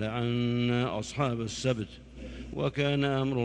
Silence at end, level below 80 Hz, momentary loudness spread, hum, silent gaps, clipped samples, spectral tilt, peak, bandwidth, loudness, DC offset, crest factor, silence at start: 0 s; -50 dBFS; 14 LU; none; none; under 0.1%; -6 dB/octave; -14 dBFS; 9.8 kHz; -30 LUFS; under 0.1%; 16 dB; 0 s